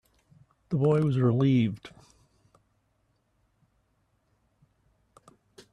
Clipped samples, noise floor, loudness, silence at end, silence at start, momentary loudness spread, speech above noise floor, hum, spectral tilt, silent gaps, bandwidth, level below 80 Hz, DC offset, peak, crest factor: under 0.1%; -72 dBFS; -25 LUFS; 3.85 s; 0.7 s; 9 LU; 48 dB; none; -9 dB/octave; none; 9.4 kHz; -66 dBFS; under 0.1%; -12 dBFS; 18 dB